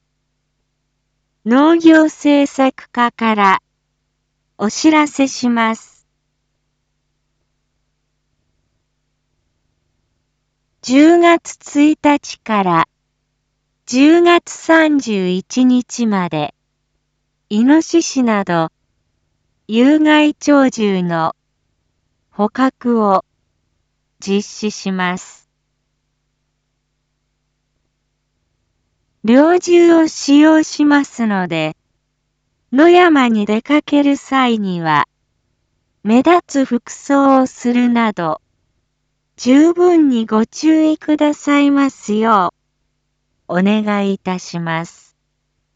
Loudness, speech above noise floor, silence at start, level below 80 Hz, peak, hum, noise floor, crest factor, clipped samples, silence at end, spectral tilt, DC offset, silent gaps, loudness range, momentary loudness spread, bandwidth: -14 LUFS; 56 dB; 1.45 s; -62 dBFS; 0 dBFS; none; -69 dBFS; 14 dB; under 0.1%; 0.9 s; -5 dB/octave; under 0.1%; none; 7 LU; 12 LU; 8 kHz